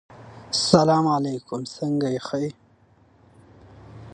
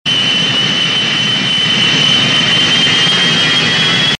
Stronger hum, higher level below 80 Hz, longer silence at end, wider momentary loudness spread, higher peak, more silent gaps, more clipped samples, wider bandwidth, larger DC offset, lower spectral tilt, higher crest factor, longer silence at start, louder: neither; second, -58 dBFS vs -48 dBFS; about the same, 0.05 s vs 0.05 s; first, 15 LU vs 3 LU; about the same, 0 dBFS vs -2 dBFS; neither; neither; about the same, 11 kHz vs 10.5 kHz; neither; first, -5.5 dB/octave vs -2.5 dB/octave; first, 24 dB vs 10 dB; about the same, 0.1 s vs 0.05 s; second, -23 LUFS vs -9 LUFS